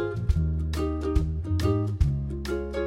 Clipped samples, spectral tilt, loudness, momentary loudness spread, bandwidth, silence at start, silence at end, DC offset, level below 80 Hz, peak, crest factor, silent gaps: under 0.1%; -8 dB/octave; -28 LUFS; 5 LU; 13.5 kHz; 0 s; 0 s; under 0.1%; -30 dBFS; -10 dBFS; 16 dB; none